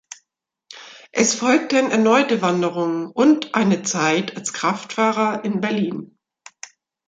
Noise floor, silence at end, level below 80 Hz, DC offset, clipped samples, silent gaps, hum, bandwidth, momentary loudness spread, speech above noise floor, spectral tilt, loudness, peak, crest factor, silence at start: -76 dBFS; 1 s; -68 dBFS; under 0.1%; under 0.1%; none; none; 9.4 kHz; 22 LU; 58 dB; -4 dB/octave; -19 LUFS; -2 dBFS; 18 dB; 0.7 s